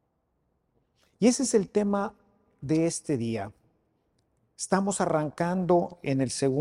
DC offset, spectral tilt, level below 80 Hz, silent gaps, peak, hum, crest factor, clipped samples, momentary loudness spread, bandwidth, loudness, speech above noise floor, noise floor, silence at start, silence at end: under 0.1%; -5.5 dB/octave; -62 dBFS; none; -8 dBFS; none; 20 dB; under 0.1%; 10 LU; 13.5 kHz; -27 LUFS; 48 dB; -75 dBFS; 1.2 s; 0 s